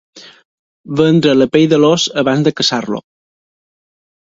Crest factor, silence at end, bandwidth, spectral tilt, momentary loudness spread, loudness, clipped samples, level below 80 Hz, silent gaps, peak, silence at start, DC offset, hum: 14 dB; 1.3 s; 7.8 kHz; -5 dB/octave; 11 LU; -12 LUFS; under 0.1%; -54 dBFS; 0.45-0.84 s; 0 dBFS; 0.15 s; under 0.1%; none